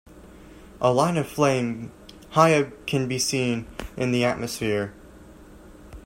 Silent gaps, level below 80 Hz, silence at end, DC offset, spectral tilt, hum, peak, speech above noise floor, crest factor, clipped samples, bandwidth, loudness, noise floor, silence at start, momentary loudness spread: none; -50 dBFS; 0.05 s; under 0.1%; -5 dB/octave; none; -2 dBFS; 24 dB; 24 dB; under 0.1%; 16 kHz; -23 LUFS; -46 dBFS; 0.1 s; 12 LU